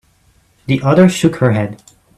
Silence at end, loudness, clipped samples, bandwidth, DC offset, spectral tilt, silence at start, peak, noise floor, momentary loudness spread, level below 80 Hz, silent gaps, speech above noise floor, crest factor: 0.4 s; -13 LUFS; under 0.1%; 13 kHz; under 0.1%; -6.5 dB/octave; 0.7 s; 0 dBFS; -54 dBFS; 13 LU; -48 dBFS; none; 42 dB; 14 dB